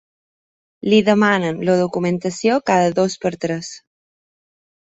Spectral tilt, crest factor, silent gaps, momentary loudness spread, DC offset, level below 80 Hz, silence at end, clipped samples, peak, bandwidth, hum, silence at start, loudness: -5.5 dB/octave; 18 dB; none; 10 LU; under 0.1%; -60 dBFS; 1.1 s; under 0.1%; -2 dBFS; 8 kHz; none; 0.85 s; -18 LUFS